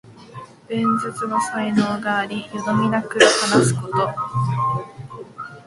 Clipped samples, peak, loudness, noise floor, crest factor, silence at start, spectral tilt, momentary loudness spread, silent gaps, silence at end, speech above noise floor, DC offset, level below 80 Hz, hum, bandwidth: under 0.1%; 0 dBFS; -20 LUFS; -40 dBFS; 20 dB; 0.05 s; -4.5 dB/octave; 22 LU; none; 0.05 s; 20 dB; under 0.1%; -56 dBFS; none; 11.5 kHz